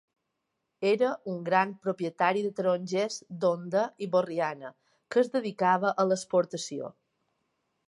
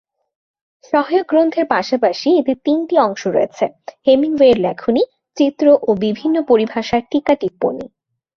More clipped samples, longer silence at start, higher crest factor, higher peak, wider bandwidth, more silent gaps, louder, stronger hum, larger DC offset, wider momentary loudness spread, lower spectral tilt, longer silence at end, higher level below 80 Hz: neither; about the same, 0.8 s vs 0.9 s; about the same, 20 dB vs 16 dB; second, -8 dBFS vs 0 dBFS; first, 11.5 kHz vs 7 kHz; neither; second, -29 LUFS vs -16 LUFS; neither; neither; about the same, 9 LU vs 8 LU; about the same, -5 dB/octave vs -6 dB/octave; first, 0.95 s vs 0.5 s; second, -82 dBFS vs -56 dBFS